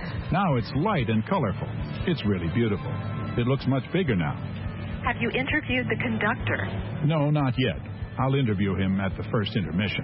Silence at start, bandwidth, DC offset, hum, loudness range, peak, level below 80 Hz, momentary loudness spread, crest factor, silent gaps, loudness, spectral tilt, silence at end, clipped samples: 0 s; 5.8 kHz; under 0.1%; none; 1 LU; -12 dBFS; -44 dBFS; 7 LU; 14 dB; none; -26 LUFS; -11.5 dB/octave; 0 s; under 0.1%